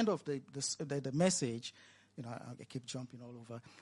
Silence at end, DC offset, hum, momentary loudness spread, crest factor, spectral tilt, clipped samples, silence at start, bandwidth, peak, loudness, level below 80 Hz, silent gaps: 0 s; under 0.1%; none; 18 LU; 20 dB; -4.5 dB/octave; under 0.1%; 0 s; 11.5 kHz; -18 dBFS; -38 LUFS; -78 dBFS; none